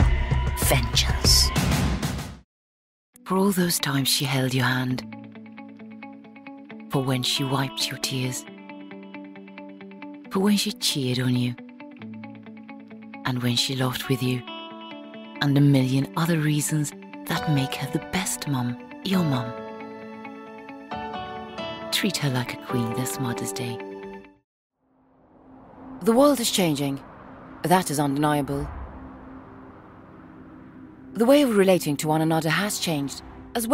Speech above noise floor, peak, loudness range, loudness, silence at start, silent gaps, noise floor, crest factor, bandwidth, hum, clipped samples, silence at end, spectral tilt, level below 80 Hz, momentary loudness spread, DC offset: 39 dB; -6 dBFS; 7 LU; -24 LUFS; 0 s; 2.44-3.13 s, 24.44-24.70 s; -62 dBFS; 18 dB; 16 kHz; none; under 0.1%; 0 s; -4.5 dB/octave; -38 dBFS; 23 LU; under 0.1%